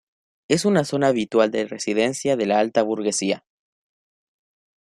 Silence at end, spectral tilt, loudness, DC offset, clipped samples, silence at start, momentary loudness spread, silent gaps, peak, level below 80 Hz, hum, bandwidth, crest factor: 1.45 s; -4.5 dB/octave; -21 LUFS; under 0.1%; under 0.1%; 0.5 s; 5 LU; none; -4 dBFS; -64 dBFS; none; 13 kHz; 18 dB